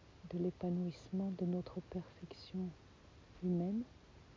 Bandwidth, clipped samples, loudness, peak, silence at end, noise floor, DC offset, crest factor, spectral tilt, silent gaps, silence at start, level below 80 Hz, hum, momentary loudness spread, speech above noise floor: 7.4 kHz; under 0.1%; -42 LUFS; -28 dBFS; 0 s; -61 dBFS; under 0.1%; 14 dB; -9 dB/octave; none; 0 s; -66 dBFS; none; 22 LU; 20 dB